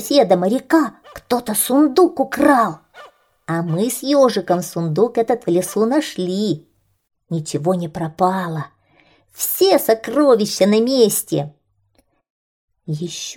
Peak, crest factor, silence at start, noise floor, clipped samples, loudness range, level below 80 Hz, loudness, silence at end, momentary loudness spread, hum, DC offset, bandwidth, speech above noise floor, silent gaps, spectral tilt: -2 dBFS; 16 dB; 0 s; -62 dBFS; under 0.1%; 4 LU; -60 dBFS; -17 LUFS; 0 s; 12 LU; none; under 0.1%; over 20 kHz; 45 dB; 12.30-12.68 s; -5 dB/octave